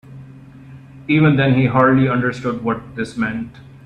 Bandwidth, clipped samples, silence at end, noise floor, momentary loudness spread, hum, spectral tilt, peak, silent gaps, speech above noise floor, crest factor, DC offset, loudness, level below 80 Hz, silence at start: 9.6 kHz; under 0.1%; 0.25 s; -39 dBFS; 14 LU; none; -8 dB/octave; 0 dBFS; none; 23 dB; 18 dB; under 0.1%; -17 LUFS; -50 dBFS; 0.1 s